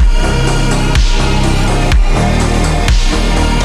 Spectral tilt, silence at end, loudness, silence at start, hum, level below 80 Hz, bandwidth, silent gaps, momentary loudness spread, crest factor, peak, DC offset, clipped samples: -5 dB/octave; 0 s; -13 LUFS; 0 s; none; -12 dBFS; 12.5 kHz; none; 1 LU; 8 dB; -2 dBFS; under 0.1%; under 0.1%